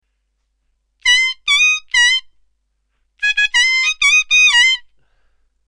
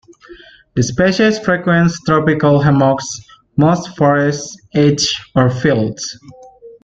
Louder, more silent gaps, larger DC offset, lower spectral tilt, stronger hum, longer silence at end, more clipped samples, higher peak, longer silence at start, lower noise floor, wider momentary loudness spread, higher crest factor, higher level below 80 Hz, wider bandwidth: about the same, -12 LUFS vs -14 LUFS; neither; neither; second, 6.5 dB/octave vs -5.5 dB/octave; neither; first, 0.9 s vs 0.15 s; neither; about the same, -2 dBFS vs -2 dBFS; first, 1.05 s vs 0.3 s; first, -68 dBFS vs -40 dBFS; about the same, 9 LU vs 11 LU; about the same, 16 dB vs 14 dB; second, -52 dBFS vs -46 dBFS; first, 13.5 kHz vs 8.4 kHz